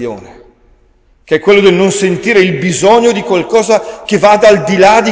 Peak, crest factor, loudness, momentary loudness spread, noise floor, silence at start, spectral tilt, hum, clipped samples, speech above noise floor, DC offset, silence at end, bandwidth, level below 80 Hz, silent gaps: 0 dBFS; 10 dB; -9 LUFS; 7 LU; -48 dBFS; 0 s; -4.5 dB/octave; none; 0.8%; 40 dB; under 0.1%; 0 s; 8 kHz; -44 dBFS; none